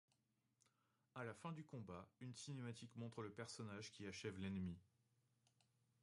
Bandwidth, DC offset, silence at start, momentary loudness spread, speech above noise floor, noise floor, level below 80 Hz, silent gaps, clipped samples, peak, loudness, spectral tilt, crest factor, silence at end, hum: 11.5 kHz; under 0.1%; 1.15 s; 8 LU; 34 dB; -87 dBFS; -74 dBFS; none; under 0.1%; -36 dBFS; -54 LUFS; -5.5 dB/octave; 18 dB; 1.2 s; none